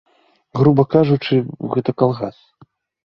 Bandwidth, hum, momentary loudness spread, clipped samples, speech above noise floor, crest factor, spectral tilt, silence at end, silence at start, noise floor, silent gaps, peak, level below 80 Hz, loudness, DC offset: 5.8 kHz; none; 12 LU; under 0.1%; 36 dB; 18 dB; -10 dB/octave; 0.75 s; 0.55 s; -53 dBFS; none; 0 dBFS; -52 dBFS; -17 LUFS; under 0.1%